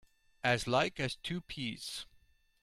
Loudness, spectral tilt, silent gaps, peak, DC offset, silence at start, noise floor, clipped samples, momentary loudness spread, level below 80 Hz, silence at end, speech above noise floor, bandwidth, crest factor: -35 LUFS; -4.5 dB/octave; none; -16 dBFS; under 0.1%; 0.45 s; -67 dBFS; under 0.1%; 12 LU; -62 dBFS; 0.6 s; 32 dB; 16 kHz; 22 dB